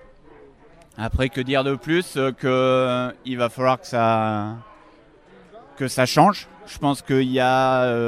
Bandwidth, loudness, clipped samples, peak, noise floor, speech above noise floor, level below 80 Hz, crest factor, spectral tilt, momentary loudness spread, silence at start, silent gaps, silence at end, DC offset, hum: 15.5 kHz; -21 LUFS; under 0.1%; 0 dBFS; -51 dBFS; 30 dB; -42 dBFS; 20 dB; -5.5 dB/octave; 10 LU; 1 s; none; 0 s; under 0.1%; none